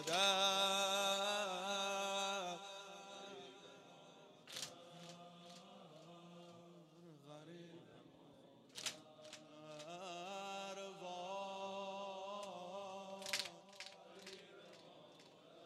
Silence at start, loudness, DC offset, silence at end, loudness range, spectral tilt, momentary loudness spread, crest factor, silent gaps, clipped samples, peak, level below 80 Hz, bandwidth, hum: 0 s; -42 LUFS; under 0.1%; 0 s; 15 LU; -1.5 dB/octave; 25 LU; 24 dB; none; under 0.1%; -20 dBFS; under -90 dBFS; 14.5 kHz; none